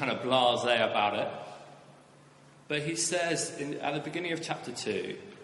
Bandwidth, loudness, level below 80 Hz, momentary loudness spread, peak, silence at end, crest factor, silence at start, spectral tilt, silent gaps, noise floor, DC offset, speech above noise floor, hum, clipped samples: 11.5 kHz; -30 LUFS; -74 dBFS; 11 LU; -10 dBFS; 0 s; 20 dB; 0 s; -3 dB/octave; none; -57 dBFS; under 0.1%; 26 dB; none; under 0.1%